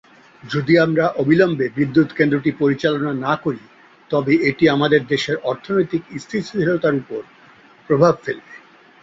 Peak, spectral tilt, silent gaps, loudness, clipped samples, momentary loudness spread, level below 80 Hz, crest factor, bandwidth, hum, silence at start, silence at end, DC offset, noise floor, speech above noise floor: -2 dBFS; -7 dB/octave; none; -18 LUFS; under 0.1%; 11 LU; -58 dBFS; 18 dB; 7.8 kHz; none; 0.45 s; 0.45 s; under 0.1%; -48 dBFS; 30 dB